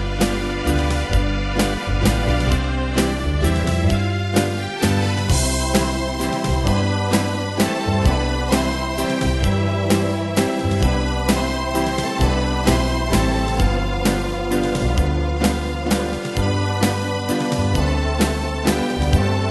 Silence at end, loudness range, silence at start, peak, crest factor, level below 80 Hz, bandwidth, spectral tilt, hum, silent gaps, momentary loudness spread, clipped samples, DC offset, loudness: 0 s; 1 LU; 0 s; -2 dBFS; 18 dB; -24 dBFS; 12.5 kHz; -5.5 dB/octave; none; none; 3 LU; under 0.1%; under 0.1%; -20 LUFS